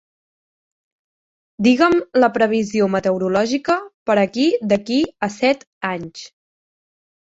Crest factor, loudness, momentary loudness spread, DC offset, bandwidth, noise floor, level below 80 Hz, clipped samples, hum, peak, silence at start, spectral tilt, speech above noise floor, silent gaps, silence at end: 18 dB; -18 LUFS; 10 LU; under 0.1%; 8 kHz; under -90 dBFS; -58 dBFS; under 0.1%; none; -2 dBFS; 1.6 s; -5.5 dB/octave; over 72 dB; 3.94-4.06 s, 5.67-5.81 s; 0.95 s